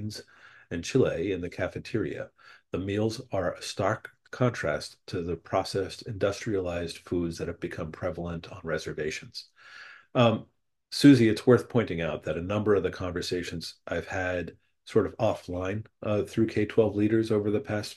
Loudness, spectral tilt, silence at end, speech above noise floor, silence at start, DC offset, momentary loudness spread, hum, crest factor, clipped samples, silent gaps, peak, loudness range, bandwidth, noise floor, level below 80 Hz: -28 LUFS; -6 dB/octave; 0 s; 26 dB; 0 s; under 0.1%; 13 LU; none; 22 dB; under 0.1%; none; -6 dBFS; 8 LU; 12.5 kHz; -54 dBFS; -56 dBFS